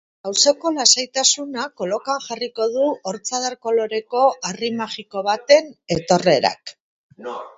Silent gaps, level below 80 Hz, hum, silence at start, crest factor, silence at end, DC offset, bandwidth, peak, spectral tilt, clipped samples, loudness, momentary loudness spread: 6.80-7.10 s; -60 dBFS; none; 0.25 s; 20 dB; 0.05 s; under 0.1%; 8 kHz; 0 dBFS; -2 dB/octave; under 0.1%; -19 LUFS; 12 LU